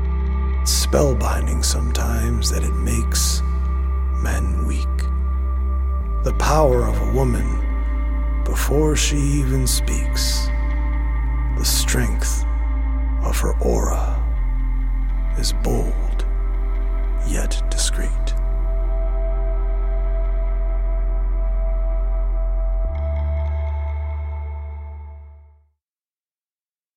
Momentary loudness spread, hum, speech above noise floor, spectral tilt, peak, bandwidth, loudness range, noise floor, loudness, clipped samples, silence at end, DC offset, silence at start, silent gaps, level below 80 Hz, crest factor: 6 LU; none; over 72 dB; -4.5 dB/octave; -2 dBFS; 16.5 kHz; 5 LU; under -90 dBFS; -22 LUFS; under 0.1%; 1.55 s; under 0.1%; 0 s; none; -20 dBFS; 16 dB